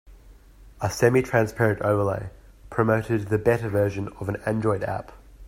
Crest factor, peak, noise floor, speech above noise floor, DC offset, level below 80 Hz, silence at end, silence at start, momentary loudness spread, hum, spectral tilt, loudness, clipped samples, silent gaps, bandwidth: 20 dB; -4 dBFS; -49 dBFS; 26 dB; under 0.1%; -48 dBFS; 0 s; 0.05 s; 10 LU; none; -7 dB/octave; -24 LUFS; under 0.1%; none; 16 kHz